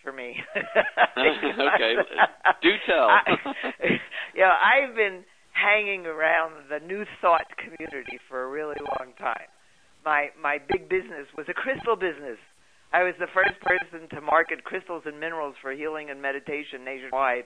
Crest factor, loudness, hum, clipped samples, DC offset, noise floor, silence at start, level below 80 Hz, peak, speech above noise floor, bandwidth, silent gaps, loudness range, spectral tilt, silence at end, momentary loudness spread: 22 dB; -24 LUFS; none; under 0.1%; under 0.1%; -61 dBFS; 0.05 s; -60 dBFS; -4 dBFS; 37 dB; 10.5 kHz; none; 8 LU; -5 dB/octave; 0 s; 15 LU